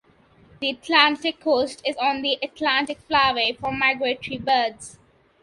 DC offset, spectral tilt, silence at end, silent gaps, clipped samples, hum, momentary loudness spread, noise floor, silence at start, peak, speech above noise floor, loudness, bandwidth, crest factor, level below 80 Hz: under 0.1%; -3 dB/octave; 0.5 s; none; under 0.1%; none; 10 LU; -55 dBFS; 0.6 s; 0 dBFS; 33 dB; -22 LUFS; 11.5 kHz; 22 dB; -56 dBFS